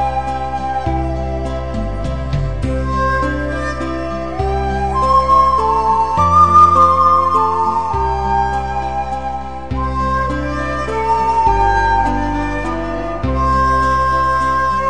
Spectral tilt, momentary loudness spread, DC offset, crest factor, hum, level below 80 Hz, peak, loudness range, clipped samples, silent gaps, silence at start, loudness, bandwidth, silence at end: -6.5 dB/octave; 11 LU; 3%; 16 dB; none; -26 dBFS; 0 dBFS; 8 LU; under 0.1%; none; 0 s; -15 LUFS; 9.8 kHz; 0 s